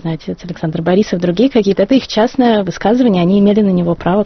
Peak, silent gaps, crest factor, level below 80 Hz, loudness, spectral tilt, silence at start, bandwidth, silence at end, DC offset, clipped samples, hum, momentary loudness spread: 0 dBFS; none; 12 dB; -42 dBFS; -13 LUFS; -6 dB/octave; 0.05 s; 6.4 kHz; 0 s; under 0.1%; under 0.1%; none; 10 LU